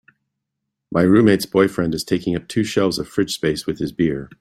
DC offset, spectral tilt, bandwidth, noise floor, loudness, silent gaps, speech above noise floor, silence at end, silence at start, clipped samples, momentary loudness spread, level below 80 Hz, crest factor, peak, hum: under 0.1%; -6 dB/octave; 16 kHz; -79 dBFS; -19 LUFS; none; 61 dB; 0.15 s; 0.9 s; under 0.1%; 8 LU; -50 dBFS; 18 dB; -2 dBFS; none